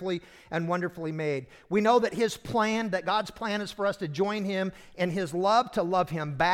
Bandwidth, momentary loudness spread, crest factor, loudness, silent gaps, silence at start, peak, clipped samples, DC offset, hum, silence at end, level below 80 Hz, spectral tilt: 16.5 kHz; 9 LU; 18 dB; -28 LUFS; none; 0 s; -10 dBFS; under 0.1%; under 0.1%; none; 0 s; -60 dBFS; -5.5 dB/octave